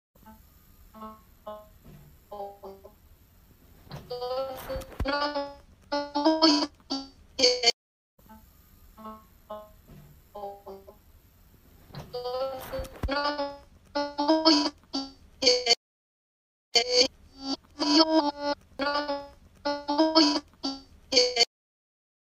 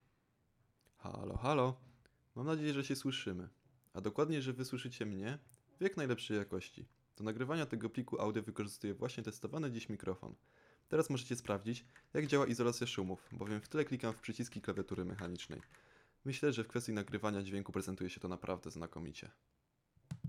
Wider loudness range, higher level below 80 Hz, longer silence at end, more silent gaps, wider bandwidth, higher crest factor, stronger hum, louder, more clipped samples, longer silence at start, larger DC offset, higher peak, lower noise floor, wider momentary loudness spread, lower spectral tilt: first, 21 LU vs 4 LU; first, -50 dBFS vs -66 dBFS; first, 0.8 s vs 0 s; first, 7.74-8.18 s, 15.77-16.72 s vs none; about the same, 15.5 kHz vs 15.5 kHz; about the same, 24 dB vs 22 dB; neither; first, -26 LUFS vs -41 LUFS; neither; second, 0.25 s vs 1 s; neither; first, -6 dBFS vs -20 dBFS; second, -58 dBFS vs -78 dBFS; first, 25 LU vs 13 LU; second, -2.5 dB/octave vs -5.5 dB/octave